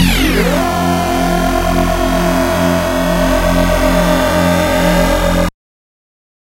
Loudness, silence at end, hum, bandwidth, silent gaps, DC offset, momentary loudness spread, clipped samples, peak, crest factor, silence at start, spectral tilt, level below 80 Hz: -13 LUFS; 1 s; none; 16 kHz; none; under 0.1%; 2 LU; under 0.1%; 0 dBFS; 12 dB; 0 s; -5 dB/octave; -20 dBFS